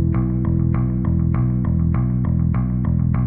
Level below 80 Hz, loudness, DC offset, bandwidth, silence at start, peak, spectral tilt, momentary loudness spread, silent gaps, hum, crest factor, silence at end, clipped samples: -28 dBFS; -20 LUFS; under 0.1%; 2.6 kHz; 0 s; -8 dBFS; -14.5 dB/octave; 1 LU; none; none; 10 dB; 0 s; under 0.1%